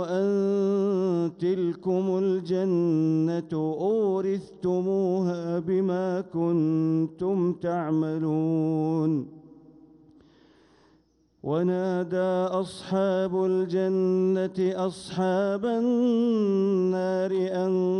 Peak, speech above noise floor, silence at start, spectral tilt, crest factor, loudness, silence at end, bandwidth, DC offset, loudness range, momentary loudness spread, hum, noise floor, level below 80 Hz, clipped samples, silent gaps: -14 dBFS; 39 dB; 0 s; -8.5 dB/octave; 10 dB; -26 LUFS; 0 s; 10.5 kHz; under 0.1%; 5 LU; 5 LU; none; -64 dBFS; -68 dBFS; under 0.1%; none